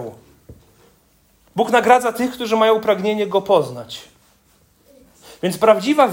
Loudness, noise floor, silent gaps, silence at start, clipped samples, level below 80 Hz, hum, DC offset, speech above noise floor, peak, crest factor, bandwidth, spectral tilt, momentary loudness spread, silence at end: -17 LUFS; -57 dBFS; none; 0 s; under 0.1%; -60 dBFS; none; under 0.1%; 41 dB; 0 dBFS; 18 dB; 16.5 kHz; -4.5 dB/octave; 16 LU; 0 s